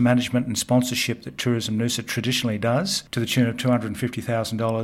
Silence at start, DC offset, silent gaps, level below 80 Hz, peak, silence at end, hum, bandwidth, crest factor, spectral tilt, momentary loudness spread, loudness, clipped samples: 0 s; under 0.1%; none; -58 dBFS; -6 dBFS; 0 s; none; 16.5 kHz; 18 dB; -5 dB/octave; 5 LU; -23 LUFS; under 0.1%